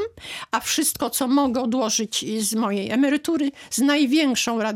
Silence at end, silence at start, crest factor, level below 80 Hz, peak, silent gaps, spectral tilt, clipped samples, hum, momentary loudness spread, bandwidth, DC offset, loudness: 0 s; 0 s; 14 dB; -60 dBFS; -8 dBFS; none; -2.5 dB/octave; under 0.1%; none; 6 LU; 17.5 kHz; under 0.1%; -22 LUFS